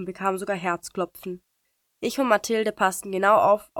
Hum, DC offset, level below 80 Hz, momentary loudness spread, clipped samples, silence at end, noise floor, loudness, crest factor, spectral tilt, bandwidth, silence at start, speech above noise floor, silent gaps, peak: none; under 0.1%; -64 dBFS; 13 LU; under 0.1%; 0 s; -74 dBFS; -24 LUFS; 18 dB; -4 dB/octave; 19 kHz; 0 s; 50 dB; none; -6 dBFS